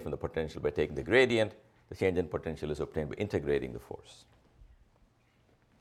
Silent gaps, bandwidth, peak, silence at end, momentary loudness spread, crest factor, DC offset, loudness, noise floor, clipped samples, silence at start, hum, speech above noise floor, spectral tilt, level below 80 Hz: none; 13.5 kHz; -12 dBFS; 1.15 s; 16 LU; 22 dB; under 0.1%; -32 LUFS; -68 dBFS; under 0.1%; 0 s; none; 36 dB; -6 dB/octave; -54 dBFS